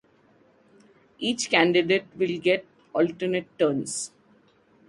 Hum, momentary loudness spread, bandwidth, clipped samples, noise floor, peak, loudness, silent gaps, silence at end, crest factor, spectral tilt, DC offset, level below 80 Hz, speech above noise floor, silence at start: none; 11 LU; 11.5 kHz; under 0.1%; -60 dBFS; -4 dBFS; -25 LUFS; none; 0.8 s; 22 dB; -4 dB/octave; under 0.1%; -68 dBFS; 36 dB; 1.2 s